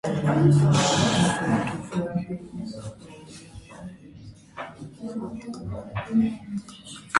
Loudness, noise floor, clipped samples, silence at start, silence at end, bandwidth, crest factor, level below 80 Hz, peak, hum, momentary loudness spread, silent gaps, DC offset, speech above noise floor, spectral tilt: -25 LUFS; -46 dBFS; under 0.1%; 0.05 s; 0 s; 11.5 kHz; 22 dB; -52 dBFS; -4 dBFS; none; 24 LU; none; under 0.1%; 23 dB; -5.5 dB/octave